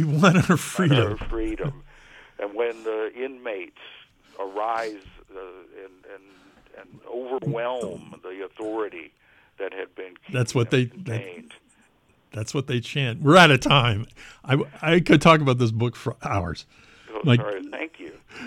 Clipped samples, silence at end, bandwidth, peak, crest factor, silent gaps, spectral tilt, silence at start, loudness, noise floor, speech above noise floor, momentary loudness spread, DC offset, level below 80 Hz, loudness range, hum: under 0.1%; 0 s; 16 kHz; -4 dBFS; 20 dB; none; -5.5 dB/octave; 0 s; -22 LUFS; -61 dBFS; 38 dB; 23 LU; under 0.1%; -46 dBFS; 15 LU; none